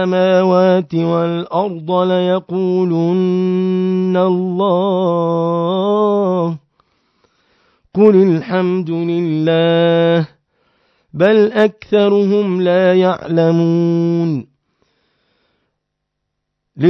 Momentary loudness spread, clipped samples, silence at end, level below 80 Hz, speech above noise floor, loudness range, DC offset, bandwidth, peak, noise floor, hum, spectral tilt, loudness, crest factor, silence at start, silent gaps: 6 LU; under 0.1%; 0 s; -64 dBFS; 61 dB; 3 LU; under 0.1%; 6.2 kHz; 0 dBFS; -75 dBFS; none; -8.5 dB/octave; -14 LUFS; 14 dB; 0 s; none